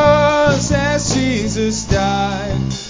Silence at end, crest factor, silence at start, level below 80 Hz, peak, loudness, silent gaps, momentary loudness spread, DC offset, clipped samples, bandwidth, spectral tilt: 0 s; 14 dB; 0 s; -30 dBFS; 0 dBFS; -16 LUFS; none; 7 LU; under 0.1%; under 0.1%; 7.8 kHz; -5 dB/octave